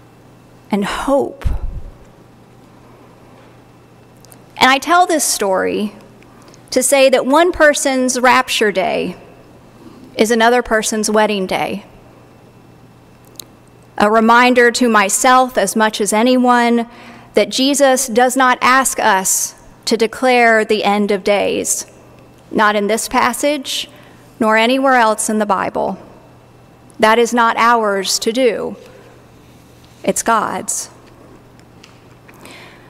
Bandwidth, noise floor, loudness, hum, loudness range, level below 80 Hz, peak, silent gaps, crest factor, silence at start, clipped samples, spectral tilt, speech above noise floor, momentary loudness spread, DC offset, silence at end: 16 kHz; -44 dBFS; -14 LUFS; none; 9 LU; -38 dBFS; 0 dBFS; none; 16 dB; 0.7 s; under 0.1%; -2.5 dB/octave; 30 dB; 12 LU; under 0.1%; 0.25 s